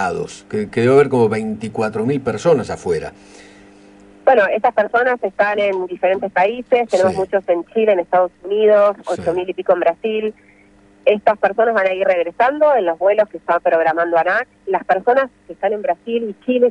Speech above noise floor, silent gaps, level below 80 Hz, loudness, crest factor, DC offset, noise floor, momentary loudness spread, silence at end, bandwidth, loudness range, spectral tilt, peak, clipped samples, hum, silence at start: 33 dB; none; -56 dBFS; -17 LUFS; 16 dB; under 0.1%; -49 dBFS; 8 LU; 0 s; 11 kHz; 2 LU; -6 dB/octave; 0 dBFS; under 0.1%; none; 0 s